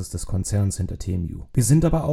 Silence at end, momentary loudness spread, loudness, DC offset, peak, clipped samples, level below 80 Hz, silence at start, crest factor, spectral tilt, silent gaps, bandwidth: 0 s; 10 LU; -23 LUFS; under 0.1%; -6 dBFS; under 0.1%; -34 dBFS; 0 s; 16 dB; -6.5 dB/octave; none; 15 kHz